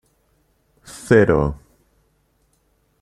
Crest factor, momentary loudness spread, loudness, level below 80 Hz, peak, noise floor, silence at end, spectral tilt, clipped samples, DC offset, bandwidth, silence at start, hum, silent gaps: 20 dB; 26 LU; -17 LUFS; -40 dBFS; -2 dBFS; -64 dBFS; 1.45 s; -7 dB/octave; under 0.1%; under 0.1%; 13.5 kHz; 0.9 s; none; none